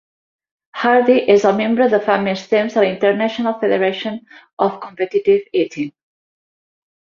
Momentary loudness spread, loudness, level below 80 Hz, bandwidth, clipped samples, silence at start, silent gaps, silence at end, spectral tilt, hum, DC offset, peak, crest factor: 12 LU; -16 LUFS; -62 dBFS; 7.2 kHz; under 0.1%; 0.75 s; 4.53-4.57 s; 1.3 s; -6 dB/octave; none; under 0.1%; -2 dBFS; 16 dB